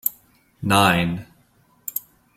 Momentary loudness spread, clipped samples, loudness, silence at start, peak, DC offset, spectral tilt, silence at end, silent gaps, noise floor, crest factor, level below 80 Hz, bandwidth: 16 LU; under 0.1%; -21 LUFS; 0.05 s; -2 dBFS; under 0.1%; -4.5 dB/octave; 0.4 s; none; -59 dBFS; 22 dB; -52 dBFS; 16.5 kHz